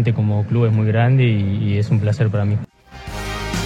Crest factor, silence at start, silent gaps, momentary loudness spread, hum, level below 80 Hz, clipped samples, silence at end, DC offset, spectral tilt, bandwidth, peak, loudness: 14 dB; 0 s; none; 13 LU; none; -38 dBFS; under 0.1%; 0 s; under 0.1%; -7.5 dB/octave; 11 kHz; -4 dBFS; -18 LUFS